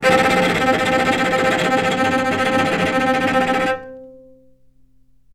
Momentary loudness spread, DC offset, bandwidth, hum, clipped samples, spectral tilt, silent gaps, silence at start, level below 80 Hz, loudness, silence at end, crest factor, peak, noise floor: 3 LU; under 0.1%; 16 kHz; none; under 0.1%; -4.5 dB/octave; none; 0 s; -50 dBFS; -17 LUFS; 1.15 s; 18 dB; 0 dBFS; -56 dBFS